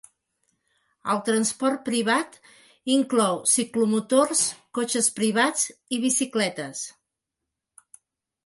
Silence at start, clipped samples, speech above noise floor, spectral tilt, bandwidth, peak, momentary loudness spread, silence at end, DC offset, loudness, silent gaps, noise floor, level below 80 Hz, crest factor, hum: 1.05 s; under 0.1%; 61 dB; -2.5 dB/octave; 12 kHz; -6 dBFS; 12 LU; 1.55 s; under 0.1%; -23 LUFS; none; -85 dBFS; -74 dBFS; 18 dB; none